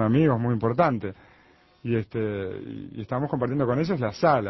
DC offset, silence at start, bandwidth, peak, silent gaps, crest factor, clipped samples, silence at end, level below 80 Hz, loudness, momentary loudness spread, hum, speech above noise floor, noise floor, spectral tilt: under 0.1%; 0 s; 6 kHz; -8 dBFS; none; 18 dB; under 0.1%; 0 s; -54 dBFS; -25 LUFS; 15 LU; none; 33 dB; -58 dBFS; -9 dB/octave